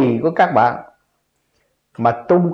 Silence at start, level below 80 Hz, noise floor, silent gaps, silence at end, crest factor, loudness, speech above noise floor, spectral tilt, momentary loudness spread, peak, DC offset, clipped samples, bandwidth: 0 s; -60 dBFS; -68 dBFS; none; 0 s; 16 dB; -16 LUFS; 52 dB; -9 dB/octave; 6 LU; -2 dBFS; under 0.1%; under 0.1%; 6.6 kHz